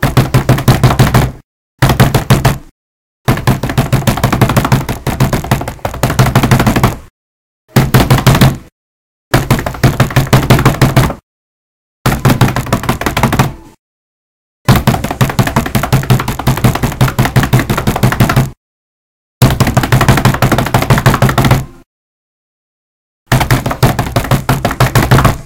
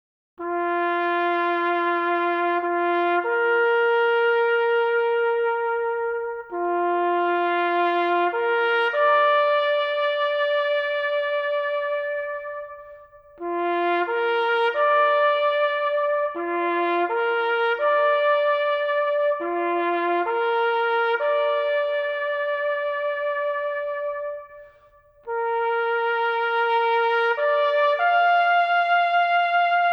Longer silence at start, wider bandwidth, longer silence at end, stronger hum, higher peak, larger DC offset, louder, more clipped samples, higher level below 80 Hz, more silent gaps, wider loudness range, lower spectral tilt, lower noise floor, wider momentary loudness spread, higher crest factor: second, 0 s vs 0.4 s; first, 17.5 kHz vs 6 kHz; about the same, 0 s vs 0 s; neither; first, 0 dBFS vs -10 dBFS; neither; first, -11 LUFS vs -22 LUFS; first, 1% vs under 0.1%; first, -24 dBFS vs -66 dBFS; first, 1.44-1.78 s, 2.71-3.25 s, 7.10-7.68 s, 8.72-9.31 s, 11.23-12.05 s, 13.79-14.65 s, 18.57-19.41 s, 21.86-23.26 s vs none; about the same, 3 LU vs 5 LU; first, -5.5 dB/octave vs -4 dB/octave; first, under -90 dBFS vs -54 dBFS; about the same, 6 LU vs 7 LU; about the same, 12 dB vs 12 dB